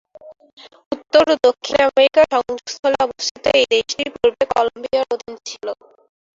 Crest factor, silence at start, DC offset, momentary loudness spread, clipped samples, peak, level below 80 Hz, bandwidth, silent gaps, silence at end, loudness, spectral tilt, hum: 16 dB; 0.25 s; under 0.1%; 16 LU; under 0.1%; -2 dBFS; -54 dBFS; 7.8 kHz; 0.53-0.57 s, 0.86-0.91 s, 2.79-2.83 s, 3.31-3.35 s; 0.65 s; -17 LUFS; -2.5 dB/octave; none